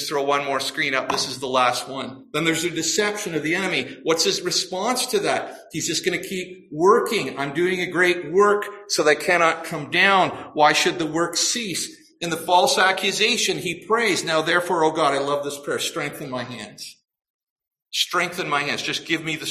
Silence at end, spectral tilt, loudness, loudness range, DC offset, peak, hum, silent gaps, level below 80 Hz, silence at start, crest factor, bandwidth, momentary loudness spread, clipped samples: 0 s; -2.5 dB/octave; -21 LUFS; 6 LU; under 0.1%; -4 dBFS; none; 17.30-17.39 s, 17.50-17.56 s; -64 dBFS; 0 s; 18 dB; 15.5 kHz; 11 LU; under 0.1%